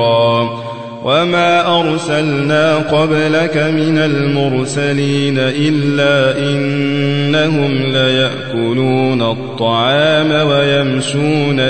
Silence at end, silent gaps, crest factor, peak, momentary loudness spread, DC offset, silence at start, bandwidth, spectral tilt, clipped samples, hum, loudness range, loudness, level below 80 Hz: 0 s; none; 10 dB; -2 dBFS; 4 LU; 1%; 0 s; 9 kHz; -6 dB/octave; under 0.1%; none; 1 LU; -13 LUFS; -50 dBFS